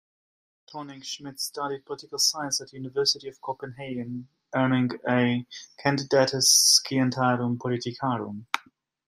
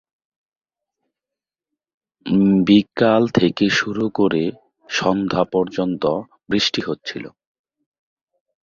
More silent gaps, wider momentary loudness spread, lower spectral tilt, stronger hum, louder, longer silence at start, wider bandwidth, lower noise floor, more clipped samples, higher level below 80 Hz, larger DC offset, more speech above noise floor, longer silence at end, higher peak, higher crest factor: neither; first, 18 LU vs 12 LU; second, -3 dB/octave vs -5.5 dB/octave; neither; second, -24 LUFS vs -19 LUFS; second, 0.7 s vs 2.25 s; first, 15.5 kHz vs 7.6 kHz; second, -57 dBFS vs -88 dBFS; neither; second, -70 dBFS vs -54 dBFS; neither; second, 31 dB vs 70 dB; second, 0.5 s vs 1.35 s; about the same, -4 dBFS vs -2 dBFS; about the same, 22 dB vs 18 dB